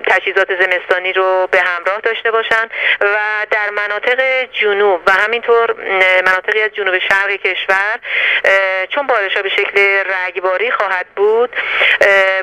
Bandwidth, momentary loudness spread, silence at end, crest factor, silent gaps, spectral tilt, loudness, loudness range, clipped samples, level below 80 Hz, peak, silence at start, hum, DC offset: 14 kHz; 5 LU; 0 s; 14 dB; none; -2 dB/octave; -13 LUFS; 1 LU; under 0.1%; -56 dBFS; 0 dBFS; 0 s; none; under 0.1%